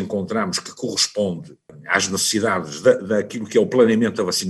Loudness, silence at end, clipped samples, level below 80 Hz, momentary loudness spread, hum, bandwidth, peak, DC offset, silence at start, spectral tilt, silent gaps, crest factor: -20 LUFS; 0 s; under 0.1%; -64 dBFS; 9 LU; none; 13 kHz; -2 dBFS; under 0.1%; 0 s; -3.5 dB/octave; none; 18 dB